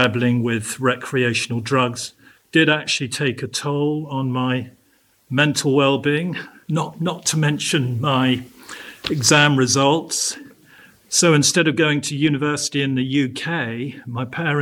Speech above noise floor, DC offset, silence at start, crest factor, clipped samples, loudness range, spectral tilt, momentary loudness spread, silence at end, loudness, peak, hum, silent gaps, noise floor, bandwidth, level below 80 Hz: 40 dB; under 0.1%; 0 s; 18 dB; under 0.1%; 4 LU; -4 dB/octave; 12 LU; 0 s; -19 LUFS; -2 dBFS; none; none; -59 dBFS; 17 kHz; -60 dBFS